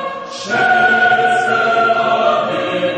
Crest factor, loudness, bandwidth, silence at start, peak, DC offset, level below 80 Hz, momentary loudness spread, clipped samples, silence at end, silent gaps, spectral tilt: 12 dB; -13 LUFS; 9.4 kHz; 0 s; -2 dBFS; under 0.1%; -56 dBFS; 8 LU; under 0.1%; 0 s; none; -4 dB/octave